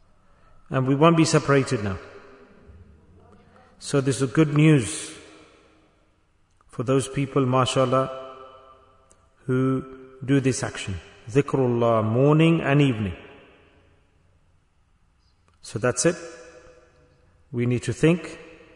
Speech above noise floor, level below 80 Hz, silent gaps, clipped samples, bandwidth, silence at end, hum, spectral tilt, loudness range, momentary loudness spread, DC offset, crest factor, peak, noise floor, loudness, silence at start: 41 dB; -56 dBFS; none; under 0.1%; 11 kHz; 0.3 s; none; -6 dB/octave; 8 LU; 20 LU; under 0.1%; 20 dB; -4 dBFS; -62 dBFS; -22 LUFS; 0.7 s